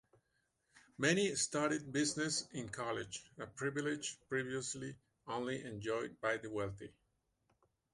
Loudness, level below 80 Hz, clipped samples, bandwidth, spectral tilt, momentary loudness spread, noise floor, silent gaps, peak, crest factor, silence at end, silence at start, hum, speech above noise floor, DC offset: -39 LUFS; -72 dBFS; under 0.1%; 11.5 kHz; -3.5 dB/octave; 13 LU; -82 dBFS; none; -20 dBFS; 22 dB; 1.05 s; 0.75 s; none; 43 dB; under 0.1%